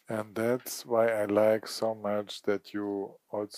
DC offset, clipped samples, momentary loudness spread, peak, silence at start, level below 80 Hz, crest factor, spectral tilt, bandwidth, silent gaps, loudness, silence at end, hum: under 0.1%; under 0.1%; 10 LU; -12 dBFS; 0.1 s; -82 dBFS; 18 dB; -5 dB/octave; 15.5 kHz; none; -30 LUFS; 0 s; none